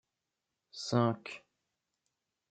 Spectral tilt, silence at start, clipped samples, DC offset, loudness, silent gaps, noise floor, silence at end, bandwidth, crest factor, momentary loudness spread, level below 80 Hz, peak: -6 dB/octave; 0.75 s; under 0.1%; under 0.1%; -34 LUFS; none; -88 dBFS; 1.15 s; 9 kHz; 22 dB; 19 LU; -80 dBFS; -16 dBFS